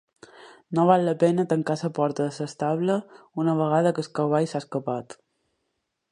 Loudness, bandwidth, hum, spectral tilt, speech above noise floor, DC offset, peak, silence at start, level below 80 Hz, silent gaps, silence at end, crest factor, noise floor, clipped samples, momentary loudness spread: -24 LUFS; 11 kHz; none; -7 dB/octave; 54 dB; under 0.1%; -4 dBFS; 0.4 s; -72 dBFS; none; 1 s; 22 dB; -78 dBFS; under 0.1%; 10 LU